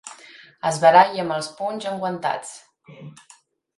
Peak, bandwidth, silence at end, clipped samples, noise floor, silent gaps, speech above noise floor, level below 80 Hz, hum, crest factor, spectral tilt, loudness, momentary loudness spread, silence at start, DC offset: 0 dBFS; 11.5 kHz; 0.7 s; under 0.1%; -47 dBFS; none; 26 dB; -70 dBFS; none; 22 dB; -4 dB/octave; -20 LUFS; 16 LU; 0.05 s; under 0.1%